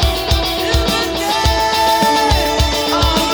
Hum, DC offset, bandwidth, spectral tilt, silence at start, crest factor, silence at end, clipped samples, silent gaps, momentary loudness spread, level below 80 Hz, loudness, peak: none; under 0.1%; over 20 kHz; -4 dB/octave; 0 s; 14 dB; 0 s; under 0.1%; none; 3 LU; -22 dBFS; -14 LUFS; -2 dBFS